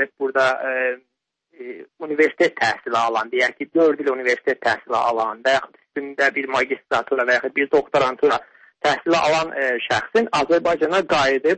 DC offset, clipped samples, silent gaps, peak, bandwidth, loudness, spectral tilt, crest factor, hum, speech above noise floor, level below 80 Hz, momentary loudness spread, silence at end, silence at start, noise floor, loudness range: under 0.1%; under 0.1%; none; -6 dBFS; 8.8 kHz; -20 LUFS; -4 dB/octave; 14 dB; none; 38 dB; -58 dBFS; 7 LU; 0 s; 0 s; -57 dBFS; 2 LU